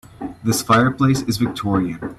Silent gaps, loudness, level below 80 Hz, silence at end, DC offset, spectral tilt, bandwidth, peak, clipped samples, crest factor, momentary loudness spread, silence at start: none; -18 LUFS; -46 dBFS; 0.05 s; under 0.1%; -5.5 dB/octave; 14 kHz; -2 dBFS; under 0.1%; 18 dB; 8 LU; 0.2 s